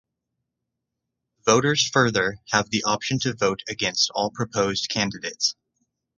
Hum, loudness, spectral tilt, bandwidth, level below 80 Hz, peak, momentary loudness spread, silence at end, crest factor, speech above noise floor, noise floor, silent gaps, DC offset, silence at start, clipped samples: none; -23 LUFS; -3 dB/octave; 11 kHz; -56 dBFS; -2 dBFS; 6 LU; 0.65 s; 22 dB; 59 dB; -82 dBFS; none; under 0.1%; 1.45 s; under 0.1%